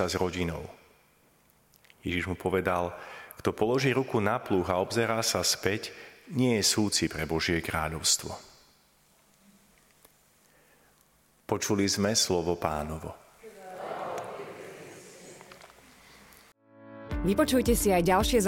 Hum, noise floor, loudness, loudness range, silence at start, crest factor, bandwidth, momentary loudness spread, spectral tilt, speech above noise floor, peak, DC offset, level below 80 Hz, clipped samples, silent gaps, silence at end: none; -65 dBFS; -28 LUFS; 14 LU; 0 s; 22 dB; 17 kHz; 22 LU; -3.5 dB/octave; 37 dB; -8 dBFS; under 0.1%; -46 dBFS; under 0.1%; none; 0 s